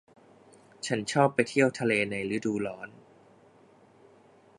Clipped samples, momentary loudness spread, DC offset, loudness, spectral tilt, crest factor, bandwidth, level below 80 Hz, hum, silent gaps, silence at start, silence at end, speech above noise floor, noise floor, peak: under 0.1%; 14 LU; under 0.1%; -28 LUFS; -5 dB/octave; 24 dB; 11.5 kHz; -68 dBFS; none; none; 0.85 s; 1.7 s; 31 dB; -58 dBFS; -8 dBFS